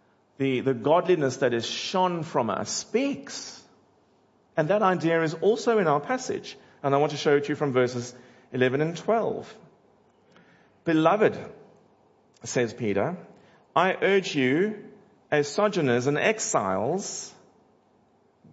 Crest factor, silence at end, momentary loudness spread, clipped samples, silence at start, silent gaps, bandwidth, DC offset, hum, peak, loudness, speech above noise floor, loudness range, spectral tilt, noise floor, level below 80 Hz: 20 dB; 1.2 s; 13 LU; under 0.1%; 0.4 s; none; 8 kHz; under 0.1%; none; -6 dBFS; -25 LUFS; 38 dB; 4 LU; -5 dB/octave; -63 dBFS; -74 dBFS